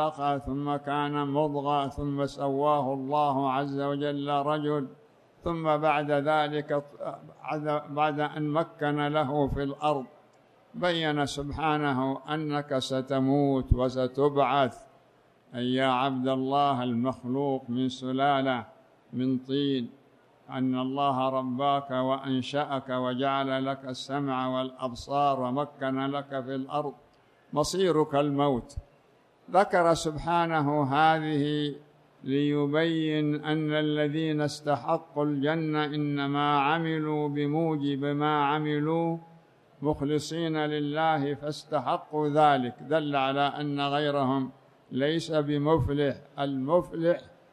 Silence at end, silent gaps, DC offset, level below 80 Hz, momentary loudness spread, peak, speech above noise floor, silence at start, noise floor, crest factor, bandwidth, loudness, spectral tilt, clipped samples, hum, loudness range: 0.25 s; none; under 0.1%; -50 dBFS; 7 LU; -10 dBFS; 34 dB; 0 s; -62 dBFS; 18 dB; 12.5 kHz; -28 LUFS; -6.5 dB/octave; under 0.1%; none; 3 LU